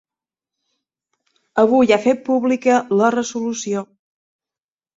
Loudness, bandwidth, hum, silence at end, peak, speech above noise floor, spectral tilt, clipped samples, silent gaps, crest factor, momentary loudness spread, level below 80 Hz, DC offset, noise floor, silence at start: -17 LUFS; 7.8 kHz; none; 1.1 s; -2 dBFS; over 74 dB; -4.5 dB/octave; under 0.1%; none; 18 dB; 10 LU; -62 dBFS; under 0.1%; under -90 dBFS; 1.55 s